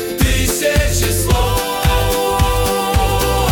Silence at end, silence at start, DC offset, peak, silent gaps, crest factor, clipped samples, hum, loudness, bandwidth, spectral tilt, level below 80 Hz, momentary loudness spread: 0 s; 0 s; under 0.1%; -2 dBFS; none; 12 dB; under 0.1%; none; -15 LUFS; 18 kHz; -4 dB/octave; -20 dBFS; 1 LU